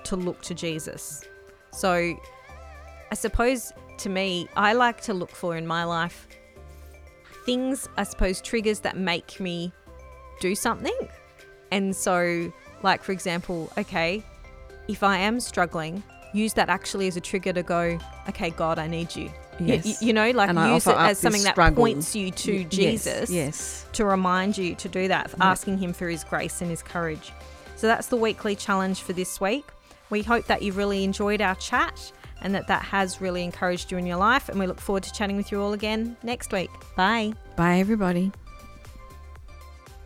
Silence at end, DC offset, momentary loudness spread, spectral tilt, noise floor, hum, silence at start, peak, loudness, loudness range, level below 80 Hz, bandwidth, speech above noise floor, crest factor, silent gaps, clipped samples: 0.05 s; under 0.1%; 14 LU; -4.5 dB/octave; -50 dBFS; none; 0 s; -4 dBFS; -25 LUFS; 7 LU; -42 dBFS; 16 kHz; 25 dB; 22 dB; none; under 0.1%